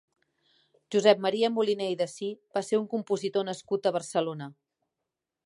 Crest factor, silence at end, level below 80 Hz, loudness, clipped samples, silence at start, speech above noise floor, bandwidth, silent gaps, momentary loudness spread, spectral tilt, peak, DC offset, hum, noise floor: 22 dB; 0.95 s; -82 dBFS; -28 LUFS; under 0.1%; 0.9 s; 59 dB; 11.5 kHz; none; 11 LU; -4.5 dB/octave; -8 dBFS; under 0.1%; none; -87 dBFS